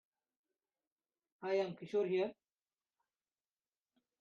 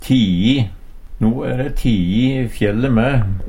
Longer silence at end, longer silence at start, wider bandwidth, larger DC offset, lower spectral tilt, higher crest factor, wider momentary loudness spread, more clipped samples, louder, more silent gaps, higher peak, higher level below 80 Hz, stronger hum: first, 1.9 s vs 0 s; first, 1.4 s vs 0 s; second, 7 kHz vs 16 kHz; neither; second, -5 dB/octave vs -7.5 dB/octave; about the same, 18 dB vs 14 dB; about the same, 6 LU vs 5 LU; neither; second, -39 LUFS vs -17 LUFS; neither; second, -24 dBFS vs -2 dBFS; second, -90 dBFS vs -28 dBFS; neither